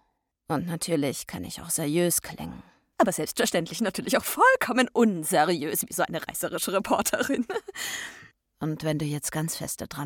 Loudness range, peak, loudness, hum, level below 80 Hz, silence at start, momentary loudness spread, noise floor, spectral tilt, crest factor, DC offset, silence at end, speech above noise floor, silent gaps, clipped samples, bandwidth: 5 LU; -8 dBFS; -26 LUFS; none; -60 dBFS; 0.5 s; 12 LU; -53 dBFS; -4 dB/octave; 18 dB; under 0.1%; 0 s; 26 dB; none; under 0.1%; 19 kHz